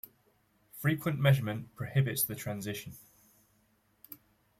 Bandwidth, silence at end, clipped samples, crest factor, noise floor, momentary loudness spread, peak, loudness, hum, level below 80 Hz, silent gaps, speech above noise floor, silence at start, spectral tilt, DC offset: 16.5 kHz; 0.45 s; under 0.1%; 20 dB; -71 dBFS; 24 LU; -14 dBFS; -32 LUFS; none; -66 dBFS; none; 40 dB; 0.75 s; -5.5 dB/octave; under 0.1%